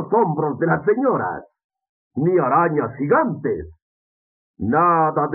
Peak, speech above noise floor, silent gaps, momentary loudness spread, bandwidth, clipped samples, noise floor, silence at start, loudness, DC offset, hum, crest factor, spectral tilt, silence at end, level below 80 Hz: -4 dBFS; over 71 dB; 1.64-1.70 s, 1.89-2.11 s, 3.82-4.54 s; 11 LU; 2.8 kHz; under 0.1%; under -90 dBFS; 0 s; -19 LUFS; under 0.1%; none; 16 dB; -10.5 dB/octave; 0 s; -56 dBFS